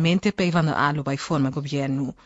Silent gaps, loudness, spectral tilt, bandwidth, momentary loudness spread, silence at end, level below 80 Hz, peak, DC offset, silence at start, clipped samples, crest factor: none; -23 LUFS; -6.5 dB/octave; 8 kHz; 6 LU; 0.15 s; -54 dBFS; -8 dBFS; under 0.1%; 0 s; under 0.1%; 16 dB